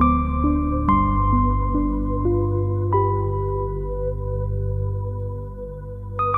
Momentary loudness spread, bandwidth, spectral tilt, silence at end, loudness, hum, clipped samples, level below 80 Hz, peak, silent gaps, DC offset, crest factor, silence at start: 12 LU; 3.7 kHz; -11.5 dB/octave; 0 s; -22 LUFS; 50 Hz at -55 dBFS; under 0.1%; -28 dBFS; -4 dBFS; none; under 0.1%; 16 dB; 0 s